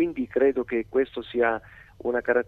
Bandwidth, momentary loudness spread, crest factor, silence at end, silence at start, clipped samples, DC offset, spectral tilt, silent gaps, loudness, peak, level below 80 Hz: 4.3 kHz; 6 LU; 16 dB; 0.05 s; 0 s; under 0.1%; under 0.1%; -7.5 dB/octave; none; -26 LUFS; -8 dBFS; -56 dBFS